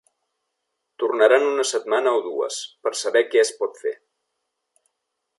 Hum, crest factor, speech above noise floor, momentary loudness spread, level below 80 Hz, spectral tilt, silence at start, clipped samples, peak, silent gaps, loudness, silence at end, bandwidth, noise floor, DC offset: none; 20 dB; 58 dB; 11 LU; -86 dBFS; -0.5 dB/octave; 1 s; under 0.1%; -4 dBFS; none; -21 LUFS; 1.45 s; 11.5 kHz; -79 dBFS; under 0.1%